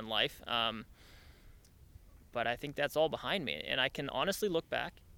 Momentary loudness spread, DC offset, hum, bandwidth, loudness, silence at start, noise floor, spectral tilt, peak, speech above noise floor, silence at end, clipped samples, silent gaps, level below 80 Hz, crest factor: 6 LU; under 0.1%; none; 18.5 kHz; -35 LUFS; 0 s; -59 dBFS; -3.5 dB/octave; -16 dBFS; 23 dB; 0 s; under 0.1%; none; -60 dBFS; 22 dB